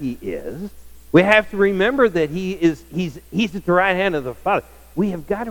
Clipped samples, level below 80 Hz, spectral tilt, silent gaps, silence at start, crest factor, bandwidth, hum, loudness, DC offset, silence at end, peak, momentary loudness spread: under 0.1%; -44 dBFS; -6.5 dB/octave; none; 0 s; 18 dB; 18.5 kHz; none; -19 LUFS; under 0.1%; 0 s; 0 dBFS; 14 LU